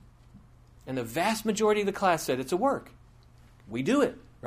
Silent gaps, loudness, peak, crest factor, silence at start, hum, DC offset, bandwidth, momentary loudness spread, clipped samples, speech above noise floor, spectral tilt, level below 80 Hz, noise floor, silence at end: none; -28 LUFS; -12 dBFS; 18 dB; 0.35 s; none; under 0.1%; 15.5 kHz; 10 LU; under 0.1%; 28 dB; -4.5 dB/octave; -58 dBFS; -55 dBFS; 0 s